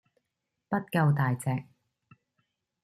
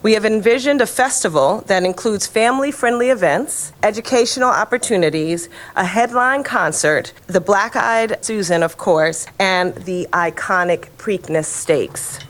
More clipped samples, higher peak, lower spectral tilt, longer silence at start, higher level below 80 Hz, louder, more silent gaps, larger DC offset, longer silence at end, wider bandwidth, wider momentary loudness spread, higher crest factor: neither; second, -12 dBFS vs -2 dBFS; first, -7.5 dB/octave vs -3.5 dB/octave; first, 0.7 s vs 0 s; second, -68 dBFS vs -54 dBFS; second, -29 LUFS vs -17 LUFS; neither; neither; first, 1.2 s vs 0 s; second, 14.5 kHz vs 19 kHz; about the same, 8 LU vs 6 LU; about the same, 18 dB vs 16 dB